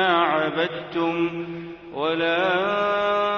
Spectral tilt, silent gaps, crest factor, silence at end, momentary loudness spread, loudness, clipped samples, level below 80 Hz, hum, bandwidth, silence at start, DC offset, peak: -6 dB/octave; none; 16 dB; 0 s; 12 LU; -23 LUFS; under 0.1%; -60 dBFS; none; 6.8 kHz; 0 s; under 0.1%; -6 dBFS